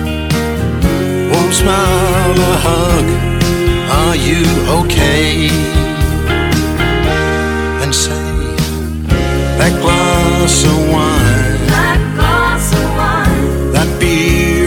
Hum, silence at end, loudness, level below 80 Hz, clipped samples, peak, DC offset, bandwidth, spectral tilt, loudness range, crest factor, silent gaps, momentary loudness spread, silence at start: none; 0 s; -12 LUFS; -18 dBFS; under 0.1%; 0 dBFS; under 0.1%; 19 kHz; -5 dB/octave; 3 LU; 12 dB; none; 4 LU; 0 s